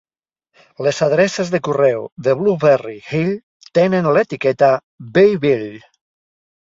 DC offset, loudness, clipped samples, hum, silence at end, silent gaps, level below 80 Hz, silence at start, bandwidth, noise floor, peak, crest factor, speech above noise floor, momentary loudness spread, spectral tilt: under 0.1%; -16 LUFS; under 0.1%; none; 0.9 s; 2.12-2.16 s, 3.43-3.60 s, 4.83-4.98 s; -58 dBFS; 0.8 s; 7.8 kHz; -75 dBFS; -2 dBFS; 16 dB; 60 dB; 8 LU; -6 dB/octave